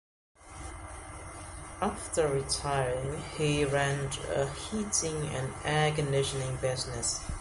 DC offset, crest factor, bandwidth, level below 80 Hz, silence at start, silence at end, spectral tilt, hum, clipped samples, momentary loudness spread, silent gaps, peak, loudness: under 0.1%; 18 dB; 11.5 kHz; -48 dBFS; 0.4 s; 0 s; -4 dB/octave; none; under 0.1%; 16 LU; none; -14 dBFS; -31 LUFS